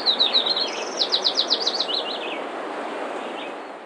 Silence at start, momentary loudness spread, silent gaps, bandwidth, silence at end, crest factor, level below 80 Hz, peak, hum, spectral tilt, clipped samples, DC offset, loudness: 0 s; 13 LU; none; 10.5 kHz; 0 s; 18 dB; -86 dBFS; -8 dBFS; none; -0.5 dB/octave; under 0.1%; under 0.1%; -22 LUFS